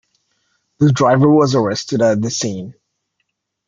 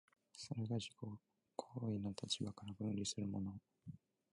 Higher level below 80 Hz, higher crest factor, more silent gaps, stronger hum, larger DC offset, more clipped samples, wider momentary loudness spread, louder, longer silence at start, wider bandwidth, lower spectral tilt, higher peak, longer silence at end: first, -56 dBFS vs -70 dBFS; second, 14 dB vs 20 dB; neither; neither; neither; neither; second, 12 LU vs 16 LU; first, -15 LUFS vs -46 LUFS; first, 0.8 s vs 0.35 s; second, 7.6 kHz vs 11.5 kHz; about the same, -6 dB/octave vs -5 dB/octave; first, -2 dBFS vs -26 dBFS; first, 0.95 s vs 0.35 s